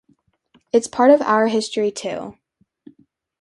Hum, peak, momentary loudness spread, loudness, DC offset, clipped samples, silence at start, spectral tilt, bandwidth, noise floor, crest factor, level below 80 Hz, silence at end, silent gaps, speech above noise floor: none; -2 dBFS; 15 LU; -18 LUFS; under 0.1%; under 0.1%; 0.75 s; -4 dB/octave; 11.5 kHz; -62 dBFS; 20 dB; -66 dBFS; 1.1 s; none; 45 dB